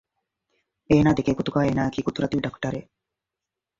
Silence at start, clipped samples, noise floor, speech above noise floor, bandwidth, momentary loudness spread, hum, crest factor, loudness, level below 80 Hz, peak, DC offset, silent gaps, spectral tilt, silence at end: 0.9 s; under 0.1%; -87 dBFS; 64 dB; 7.6 kHz; 12 LU; none; 20 dB; -23 LUFS; -48 dBFS; -4 dBFS; under 0.1%; none; -7.5 dB/octave; 1 s